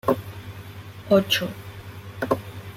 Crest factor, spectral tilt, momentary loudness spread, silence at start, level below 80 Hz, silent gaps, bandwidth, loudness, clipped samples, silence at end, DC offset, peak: 20 dB; -5 dB/octave; 20 LU; 0.05 s; -56 dBFS; none; 16.5 kHz; -24 LUFS; under 0.1%; 0 s; under 0.1%; -6 dBFS